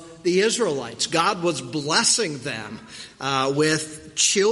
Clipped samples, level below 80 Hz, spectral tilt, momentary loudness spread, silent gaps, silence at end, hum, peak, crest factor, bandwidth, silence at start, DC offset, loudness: under 0.1%; -62 dBFS; -2.5 dB/octave; 13 LU; none; 0 s; none; -4 dBFS; 18 dB; 11.5 kHz; 0 s; under 0.1%; -22 LUFS